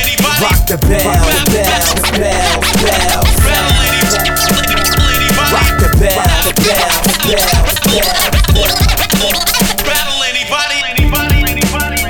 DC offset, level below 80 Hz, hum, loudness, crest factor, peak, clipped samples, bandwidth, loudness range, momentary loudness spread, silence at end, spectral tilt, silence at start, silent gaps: under 0.1%; -16 dBFS; none; -10 LUFS; 10 dB; 0 dBFS; under 0.1%; over 20 kHz; 1 LU; 2 LU; 0 s; -3 dB/octave; 0 s; none